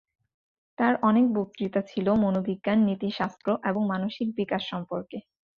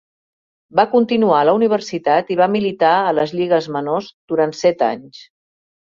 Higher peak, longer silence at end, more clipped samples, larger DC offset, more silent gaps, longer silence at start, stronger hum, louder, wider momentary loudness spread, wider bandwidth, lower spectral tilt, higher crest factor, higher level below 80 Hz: second, -10 dBFS vs 0 dBFS; second, 0.4 s vs 0.7 s; neither; neither; second, none vs 4.14-4.28 s; about the same, 0.8 s vs 0.75 s; neither; second, -26 LUFS vs -17 LUFS; first, 10 LU vs 7 LU; about the same, 6.8 kHz vs 7.4 kHz; first, -8 dB/octave vs -6 dB/octave; about the same, 18 dB vs 16 dB; about the same, -64 dBFS vs -62 dBFS